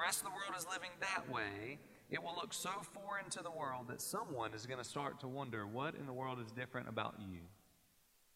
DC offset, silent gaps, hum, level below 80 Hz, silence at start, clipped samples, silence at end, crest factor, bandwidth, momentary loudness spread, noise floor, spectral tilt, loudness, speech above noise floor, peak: under 0.1%; none; none; -78 dBFS; 0 s; under 0.1%; 0.75 s; 20 dB; 16 kHz; 6 LU; -73 dBFS; -3 dB/octave; -44 LUFS; 28 dB; -24 dBFS